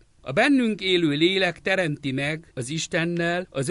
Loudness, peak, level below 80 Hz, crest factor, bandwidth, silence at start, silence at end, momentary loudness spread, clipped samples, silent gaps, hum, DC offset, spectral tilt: -23 LUFS; -8 dBFS; -58 dBFS; 16 dB; 11.5 kHz; 0.25 s; 0 s; 8 LU; under 0.1%; none; none; under 0.1%; -4.5 dB/octave